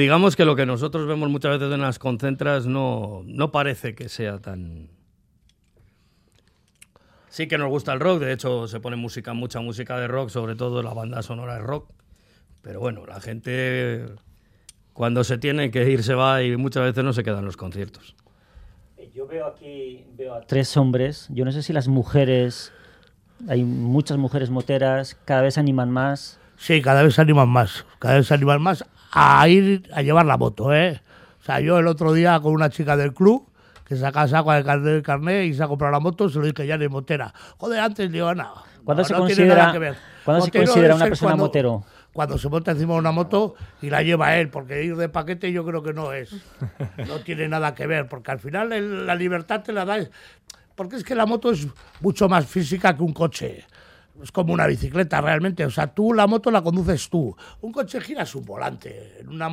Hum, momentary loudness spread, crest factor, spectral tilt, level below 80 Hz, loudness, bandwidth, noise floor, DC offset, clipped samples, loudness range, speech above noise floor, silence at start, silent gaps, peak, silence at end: none; 16 LU; 20 dB; -6.5 dB/octave; -50 dBFS; -21 LUFS; 15 kHz; -61 dBFS; under 0.1%; under 0.1%; 12 LU; 41 dB; 0 s; none; 0 dBFS; 0 s